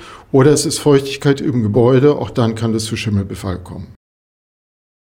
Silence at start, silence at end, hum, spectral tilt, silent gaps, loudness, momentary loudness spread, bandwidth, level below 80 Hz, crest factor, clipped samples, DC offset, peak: 0 s; 1.1 s; none; -6 dB/octave; none; -15 LUFS; 13 LU; 16.5 kHz; -44 dBFS; 14 dB; under 0.1%; under 0.1%; 0 dBFS